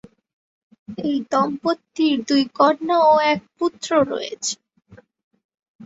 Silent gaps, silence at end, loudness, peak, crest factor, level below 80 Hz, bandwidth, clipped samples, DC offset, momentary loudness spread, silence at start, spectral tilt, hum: 5.24-5.31 s, 5.44-5.49 s, 5.68-5.79 s; 0 s; -20 LUFS; -2 dBFS; 18 dB; -64 dBFS; 8 kHz; under 0.1%; under 0.1%; 11 LU; 0.9 s; -3.5 dB/octave; none